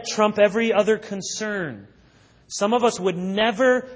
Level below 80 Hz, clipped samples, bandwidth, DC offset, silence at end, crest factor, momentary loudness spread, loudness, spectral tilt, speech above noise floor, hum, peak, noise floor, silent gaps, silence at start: -62 dBFS; under 0.1%; 8 kHz; under 0.1%; 0 s; 18 dB; 11 LU; -21 LUFS; -4 dB/octave; 33 dB; none; -4 dBFS; -54 dBFS; none; 0 s